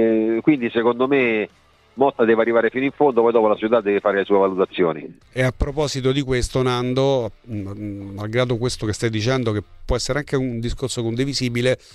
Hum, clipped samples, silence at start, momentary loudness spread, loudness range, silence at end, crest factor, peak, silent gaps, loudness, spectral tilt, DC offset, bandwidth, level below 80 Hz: none; under 0.1%; 0 s; 12 LU; 5 LU; 0.2 s; 16 dB; -4 dBFS; none; -20 LUFS; -6 dB/octave; under 0.1%; 13.5 kHz; -38 dBFS